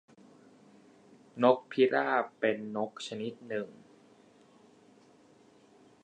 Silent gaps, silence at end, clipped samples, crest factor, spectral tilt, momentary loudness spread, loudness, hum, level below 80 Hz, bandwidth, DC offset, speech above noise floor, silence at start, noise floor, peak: none; 2.3 s; under 0.1%; 24 dB; -5.5 dB/octave; 12 LU; -31 LUFS; none; -86 dBFS; 9.4 kHz; under 0.1%; 31 dB; 1.35 s; -61 dBFS; -10 dBFS